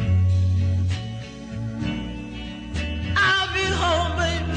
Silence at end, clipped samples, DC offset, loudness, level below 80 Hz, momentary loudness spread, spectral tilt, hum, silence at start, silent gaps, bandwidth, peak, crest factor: 0 s; under 0.1%; under 0.1%; -23 LUFS; -34 dBFS; 15 LU; -5 dB/octave; none; 0 s; none; 9.4 kHz; -10 dBFS; 14 dB